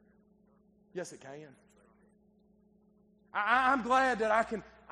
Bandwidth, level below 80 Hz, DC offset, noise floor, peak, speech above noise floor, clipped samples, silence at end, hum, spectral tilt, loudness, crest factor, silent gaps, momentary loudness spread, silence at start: 11 kHz; -66 dBFS; under 0.1%; -67 dBFS; -12 dBFS; 36 dB; under 0.1%; 0.25 s; none; -4 dB/octave; -30 LUFS; 22 dB; none; 21 LU; 0.95 s